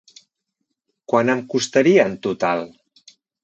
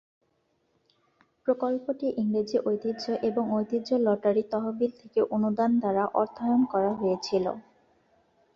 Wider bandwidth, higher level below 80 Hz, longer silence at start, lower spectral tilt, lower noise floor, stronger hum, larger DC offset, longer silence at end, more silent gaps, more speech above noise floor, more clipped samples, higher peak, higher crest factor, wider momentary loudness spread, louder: first, 8.4 kHz vs 7.2 kHz; about the same, -66 dBFS vs -70 dBFS; second, 1.1 s vs 1.45 s; second, -5 dB/octave vs -7 dB/octave; first, -77 dBFS vs -72 dBFS; neither; neither; second, 0.75 s vs 0.95 s; neither; first, 59 dB vs 46 dB; neither; first, -2 dBFS vs -12 dBFS; about the same, 20 dB vs 16 dB; about the same, 8 LU vs 6 LU; first, -19 LUFS vs -27 LUFS